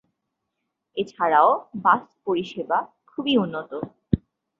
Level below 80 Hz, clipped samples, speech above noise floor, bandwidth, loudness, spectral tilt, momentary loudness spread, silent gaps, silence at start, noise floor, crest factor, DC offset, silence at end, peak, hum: -50 dBFS; under 0.1%; 57 dB; 7.6 kHz; -23 LUFS; -7 dB/octave; 15 LU; none; 0.95 s; -80 dBFS; 20 dB; under 0.1%; 0.4 s; -4 dBFS; none